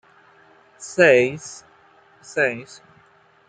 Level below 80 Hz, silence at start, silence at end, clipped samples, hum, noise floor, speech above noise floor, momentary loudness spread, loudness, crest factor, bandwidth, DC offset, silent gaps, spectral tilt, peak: -68 dBFS; 0.8 s; 0.85 s; under 0.1%; none; -56 dBFS; 36 dB; 24 LU; -19 LUFS; 20 dB; 9.4 kHz; under 0.1%; none; -4.5 dB/octave; -2 dBFS